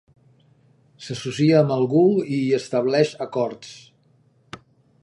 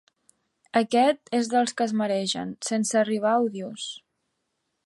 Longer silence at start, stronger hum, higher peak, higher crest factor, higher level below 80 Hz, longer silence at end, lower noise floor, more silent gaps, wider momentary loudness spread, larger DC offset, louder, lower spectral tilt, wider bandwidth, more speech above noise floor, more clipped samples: first, 1 s vs 0.75 s; neither; first, -4 dBFS vs -8 dBFS; about the same, 20 dB vs 18 dB; first, -66 dBFS vs -76 dBFS; second, 0.45 s vs 0.9 s; second, -60 dBFS vs -78 dBFS; neither; first, 25 LU vs 12 LU; neither; first, -20 LUFS vs -25 LUFS; first, -7 dB/octave vs -4 dB/octave; about the same, 11.5 kHz vs 11.5 kHz; second, 39 dB vs 53 dB; neither